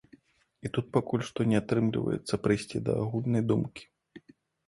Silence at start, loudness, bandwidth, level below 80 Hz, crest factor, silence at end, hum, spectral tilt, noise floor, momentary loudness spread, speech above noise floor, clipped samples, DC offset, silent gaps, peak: 0.65 s; -30 LUFS; 11.5 kHz; -58 dBFS; 20 dB; 0.5 s; none; -7 dB/octave; -60 dBFS; 7 LU; 32 dB; under 0.1%; under 0.1%; none; -10 dBFS